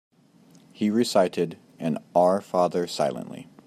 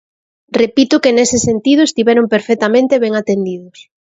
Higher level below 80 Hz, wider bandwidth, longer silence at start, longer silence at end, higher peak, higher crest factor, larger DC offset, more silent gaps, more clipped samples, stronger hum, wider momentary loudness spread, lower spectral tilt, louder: second, -72 dBFS vs -48 dBFS; first, 15 kHz vs 8 kHz; first, 0.8 s vs 0.5 s; about the same, 0.25 s vs 0.35 s; second, -8 dBFS vs 0 dBFS; about the same, 18 dB vs 14 dB; neither; neither; neither; neither; first, 10 LU vs 7 LU; first, -5.5 dB/octave vs -4 dB/octave; second, -25 LUFS vs -13 LUFS